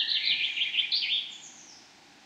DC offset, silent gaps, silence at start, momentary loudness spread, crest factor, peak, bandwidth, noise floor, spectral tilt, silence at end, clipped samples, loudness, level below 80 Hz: under 0.1%; none; 0 s; 18 LU; 18 dB; -12 dBFS; 14.5 kHz; -55 dBFS; 2 dB/octave; 0.4 s; under 0.1%; -26 LUFS; -82 dBFS